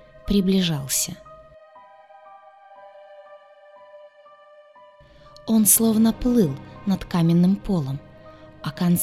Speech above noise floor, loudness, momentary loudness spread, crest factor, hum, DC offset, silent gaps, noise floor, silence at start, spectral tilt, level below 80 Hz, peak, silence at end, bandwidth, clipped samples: 30 dB; -20 LUFS; 17 LU; 22 dB; none; under 0.1%; none; -50 dBFS; 0.25 s; -5 dB/octave; -44 dBFS; -2 dBFS; 0 s; 16 kHz; under 0.1%